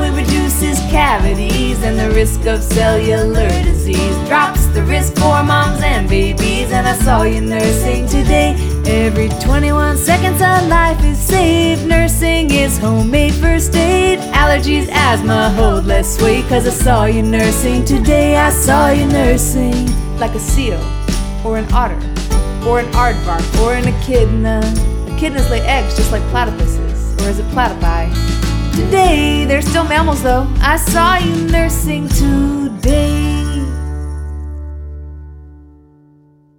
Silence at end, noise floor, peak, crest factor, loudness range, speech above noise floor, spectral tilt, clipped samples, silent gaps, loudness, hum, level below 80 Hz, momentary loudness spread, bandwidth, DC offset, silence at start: 1 s; -48 dBFS; 0 dBFS; 12 dB; 4 LU; 36 dB; -5 dB/octave; under 0.1%; none; -13 LUFS; none; -16 dBFS; 7 LU; 19 kHz; under 0.1%; 0 s